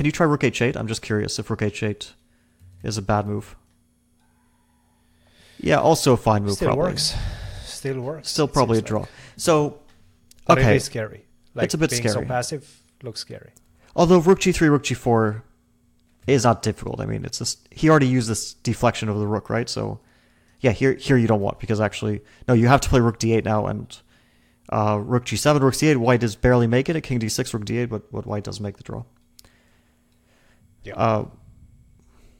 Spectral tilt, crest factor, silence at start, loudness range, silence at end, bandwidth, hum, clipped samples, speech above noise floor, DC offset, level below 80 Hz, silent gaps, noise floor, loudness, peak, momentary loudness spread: -5.5 dB/octave; 22 dB; 0 s; 10 LU; 1.1 s; 16.5 kHz; none; under 0.1%; 41 dB; under 0.1%; -42 dBFS; none; -62 dBFS; -21 LUFS; 0 dBFS; 16 LU